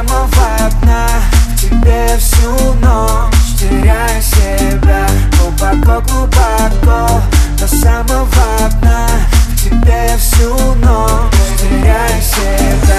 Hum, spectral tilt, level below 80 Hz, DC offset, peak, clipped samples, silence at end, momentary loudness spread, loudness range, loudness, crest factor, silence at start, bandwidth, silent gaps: none; -5 dB/octave; -10 dBFS; under 0.1%; 0 dBFS; 0.2%; 0 s; 2 LU; 0 LU; -11 LUFS; 8 dB; 0 s; 14.5 kHz; none